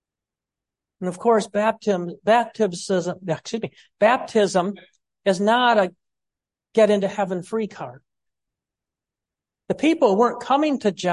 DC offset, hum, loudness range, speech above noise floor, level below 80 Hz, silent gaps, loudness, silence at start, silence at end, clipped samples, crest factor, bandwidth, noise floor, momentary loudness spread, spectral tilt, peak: under 0.1%; none; 4 LU; 68 dB; -68 dBFS; none; -21 LUFS; 1 s; 0 s; under 0.1%; 18 dB; 11.5 kHz; -88 dBFS; 12 LU; -5 dB/octave; -6 dBFS